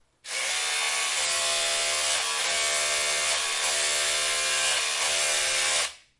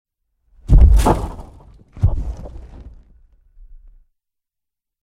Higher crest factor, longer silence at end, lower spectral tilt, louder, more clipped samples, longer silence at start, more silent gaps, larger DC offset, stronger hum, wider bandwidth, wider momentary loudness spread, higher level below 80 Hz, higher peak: about the same, 14 dB vs 18 dB; second, 0.2 s vs 2.4 s; second, 2.5 dB/octave vs -7.5 dB/octave; second, -24 LUFS vs -17 LUFS; neither; second, 0.25 s vs 0.7 s; neither; neither; neither; second, 11.5 kHz vs 13 kHz; second, 2 LU vs 27 LU; second, -62 dBFS vs -20 dBFS; second, -12 dBFS vs 0 dBFS